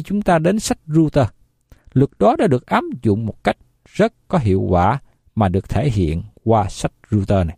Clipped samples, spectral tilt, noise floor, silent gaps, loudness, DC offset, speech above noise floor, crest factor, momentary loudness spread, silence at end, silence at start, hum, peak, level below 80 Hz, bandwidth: under 0.1%; -7 dB/octave; -49 dBFS; none; -18 LUFS; under 0.1%; 32 dB; 16 dB; 8 LU; 0.05 s; 0 s; none; -2 dBFS; -36 dBFS; 14 kHz